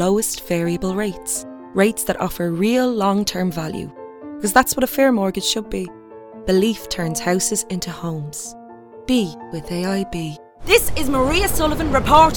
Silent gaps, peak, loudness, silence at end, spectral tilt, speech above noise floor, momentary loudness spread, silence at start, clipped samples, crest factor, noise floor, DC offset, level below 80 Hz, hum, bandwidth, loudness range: none; 0 dBFS; -20 LUFS; 0 s; -4 dB/octave; 20 dB; 15 LU; 0 s; under 0.1%; 20 dB; -38 dBFS; under 0.1%; -36 dBFS; none; 18 kHz; 4 LU